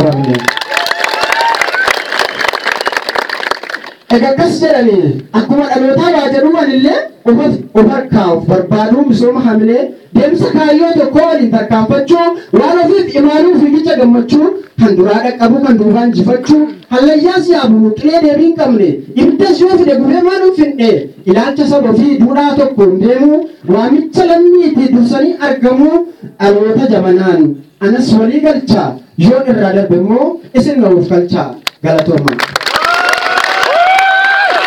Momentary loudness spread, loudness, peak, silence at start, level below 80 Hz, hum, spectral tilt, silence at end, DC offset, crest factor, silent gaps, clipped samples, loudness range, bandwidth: 5 LU; -9 LUFS; 0 dBFS; 0 s; -46 dBFS; none; -6 dB/octave; 0 s; under 0.1%; 8 dB; none; 0.6%; 2 LU; 16 kHz